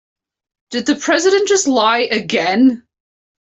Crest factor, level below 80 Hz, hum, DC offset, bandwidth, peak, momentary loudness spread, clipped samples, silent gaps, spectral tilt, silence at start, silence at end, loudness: 14 dB; -60 dBFS; none; under 0.1%; 8.4 kHz; -2 dBFS; 8 LU; under 0.1%; none; -2.5 dB/octave; 0.7 s; 0.7 s; -14 LUFS